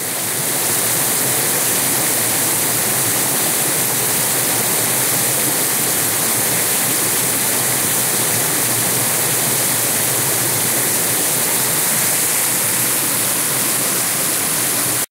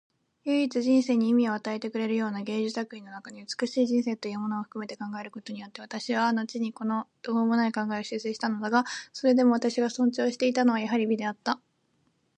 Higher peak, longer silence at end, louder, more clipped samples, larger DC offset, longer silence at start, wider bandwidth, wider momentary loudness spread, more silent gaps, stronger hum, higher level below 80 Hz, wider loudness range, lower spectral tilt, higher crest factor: first, -2 dBFS vs -10 dBFS; second, 0.05 s vs 0.8 s; first, -14 LUFS vs -28 LUFS; neither; neither; second, 0 s vs 0.45 s; first, 16 kHz vs 9.4 kHz; second, 1 LU vs 13 LU; neither; neither; first, -56 dBFS vs -80 dBFS; second, 0 LU vs 6 LU; second, -1.5 dB/octave vs -5 dB/octave; about the same, 14 dB vs 18 dB